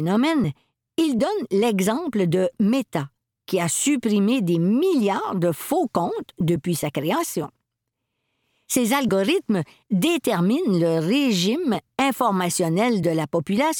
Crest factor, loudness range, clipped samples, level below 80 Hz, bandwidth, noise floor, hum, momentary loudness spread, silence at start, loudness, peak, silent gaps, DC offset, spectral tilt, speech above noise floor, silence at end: 16 dB; 4 LU; under 0.1%; -62 dBFS; 19 kHz; -81 dBFS; none; 6 LU; 0 s; -22 LUFS; -6 dBFS; none; under 0.1%; -5 dB/octave; 59 dB; 0 s